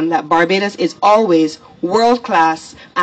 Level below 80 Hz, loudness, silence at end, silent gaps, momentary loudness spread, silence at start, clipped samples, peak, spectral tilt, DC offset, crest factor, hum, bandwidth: -58 dBFS; -14 LUFS; 0 s; none; 10 LU; 0 s; under 0.1%; -2 dBFS; -5 dB/octave; under 0.1%; 12 dB; none; 8.8 kHz